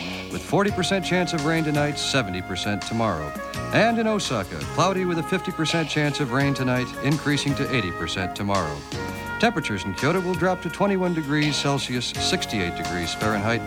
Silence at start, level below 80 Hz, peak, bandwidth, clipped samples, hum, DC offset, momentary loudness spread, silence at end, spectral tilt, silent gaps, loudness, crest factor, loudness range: 0 s; -46 dBFS; -6 dBFS; 18.5 kHz; under 0.1%; none; under 0.1%; 6 LU; 0 s; -4.5 dB/octave; none; -24 LUFS; 18 dB; 2 LU